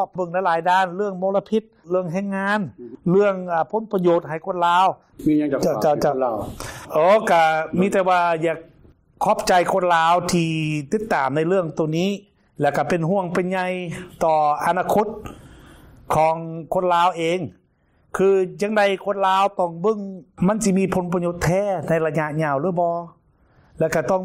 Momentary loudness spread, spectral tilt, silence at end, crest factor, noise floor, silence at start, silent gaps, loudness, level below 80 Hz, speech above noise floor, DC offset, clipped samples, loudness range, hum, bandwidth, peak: 8 LU; -6 dB/octave; 0 s; 14 dB; -61 dBFS; 0 s; none; -20 LUFS; -52 dBFS; 41 dB; under 0.1%; under 0.1%; 3 LU; none; 16 kHz; -8 dBFS